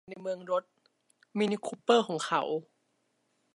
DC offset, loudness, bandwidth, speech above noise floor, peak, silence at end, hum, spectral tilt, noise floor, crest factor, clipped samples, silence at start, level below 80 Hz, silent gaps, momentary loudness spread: under 0.1%; -31 LUFS; 11.5 kHz; 45 dB; -12 dBFS; 0.9 s; none; -4.5 dB/octave; -76 dBFS; 22 dB; under 0.1%; 0.1 s; -84 dBFS; none; 12 LU